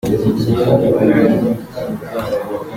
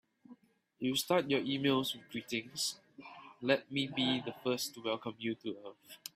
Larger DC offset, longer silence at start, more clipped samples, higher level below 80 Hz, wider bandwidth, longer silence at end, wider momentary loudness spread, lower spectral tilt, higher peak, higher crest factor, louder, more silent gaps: neither; second, 0.05 s vs 0.3 s; neither; first, -42 dBFS vs -78 dBFS; about the same, 16.5 kHz vs 16 kHz; about the same, 0 s vs 0.05 s; second, 11 LU vs 17 LU; first, -8 dB/octave vs -4 dB/octave; first, -2 dBFS vs -14 dBFS; second, 14 dB vs 24 dB; first, -16 LUFS vs -35 LUFS; neither